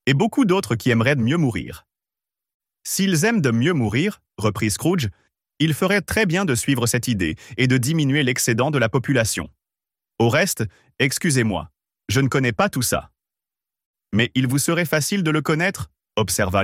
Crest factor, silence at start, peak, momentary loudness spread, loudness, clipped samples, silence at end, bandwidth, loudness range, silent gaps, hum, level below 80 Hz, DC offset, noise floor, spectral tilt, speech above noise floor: 16 dB; 0.05 s; -4 dBFS; 7 LU; -20 LUFS; under 0.1%; 0 s; 16.5 kHz; 3 LU; 2.54-2.60 s, 13.86-13.94 s; none; -48 dBFS; under 0.1%; -89 dBFS; -4.5 dB/octave; 69 dB